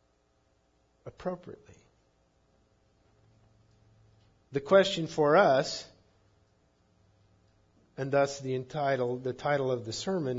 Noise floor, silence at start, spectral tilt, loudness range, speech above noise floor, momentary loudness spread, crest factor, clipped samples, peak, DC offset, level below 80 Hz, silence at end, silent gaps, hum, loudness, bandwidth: -70 dBFS; 1.05 s; -5 dB/octave; 18 LU; 42 dB; 21 LU; 22 dB; under 0.1%; -10 dBFS; under 0.1%; -68 dBFS; 0 s; none; none; -29 LUFS; 7.8 kHz